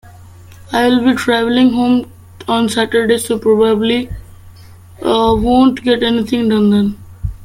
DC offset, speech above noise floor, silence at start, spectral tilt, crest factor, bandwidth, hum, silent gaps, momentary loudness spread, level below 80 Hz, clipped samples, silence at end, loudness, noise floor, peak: under 0.1%; 25 dB; 0.05 s; -5.5 dB/octave; 14 dB; 15.5 kHz; none; none; 10 LU; -36 dBFS; under 0.1%; 0 s; -13 LUFS; -38 dBFS; 0 dBFS